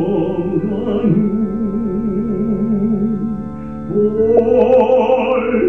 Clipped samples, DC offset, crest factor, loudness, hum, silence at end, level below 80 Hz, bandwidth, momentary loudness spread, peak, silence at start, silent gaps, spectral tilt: under 0.1%; 1%; 14 dB; -16 LUFS; none; 0 s; -40 dBFS; 3.5 kHz; 9 LU; -2 dBFS; 0 s; none; -10 dB/octave